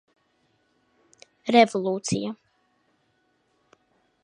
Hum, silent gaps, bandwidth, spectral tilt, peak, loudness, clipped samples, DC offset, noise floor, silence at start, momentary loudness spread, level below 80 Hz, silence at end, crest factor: none; none; 10.5 kHz; -4.5 dB/octave; -4 dBFS; -23 LUFS; under 0.1%; under 0.1%; -69 dBFS; 1.45 s; 17 LU; -66 dBFS; 1.9 s; 24 dB